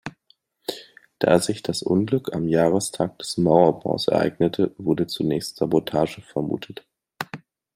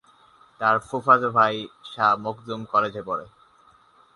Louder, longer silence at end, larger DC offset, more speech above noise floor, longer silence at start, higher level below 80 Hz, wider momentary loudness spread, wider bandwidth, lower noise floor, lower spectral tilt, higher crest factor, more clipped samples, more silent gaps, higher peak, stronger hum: about the same, -22 LUFS vs -22 LUFS; second, 0.4 s vs 0.9 s; neither; first, 41 dB vs 34 dB; second, 0.05 s vs 0.6 s; first, -58 dBFS vs -64 dBFS; about the same, 15 LU vs 14 LU; first, 16 kHz vs 11.5 kHz; first, -63 dBFS vs -57 dBFS; about the same, -5.5 dB/octave vs -5.5 dB/octave; about the same, 22 dB vs 22 dB; neither; neither; about the same, -2 dBFS vs -4 dBFS; neither